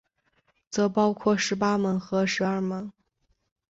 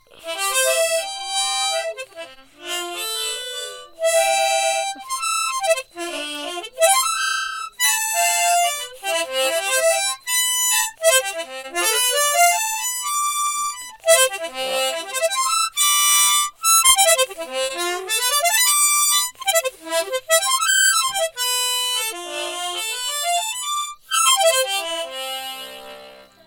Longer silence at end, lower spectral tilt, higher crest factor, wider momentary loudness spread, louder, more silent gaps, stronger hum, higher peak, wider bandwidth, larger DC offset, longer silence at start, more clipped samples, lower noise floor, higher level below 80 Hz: first, 0.8 s vs 0.25 s; first, -5 dB/octave vs 2.5 dB/octave; about the same, 16 dB vs 20 dB; second, 9 LU vs 13 LU; second, -26 LUFS vs -18 LUFS; neither; neither; second, -10 dBFS vs -2 dBFS; second, 8 kHz vs 18 kHz; neither; first, 0.7 s vs 0.15 s; neither; first, -72 dBFS vs -43 dBFS; about the same, -64 dBFS vs -64 dBFS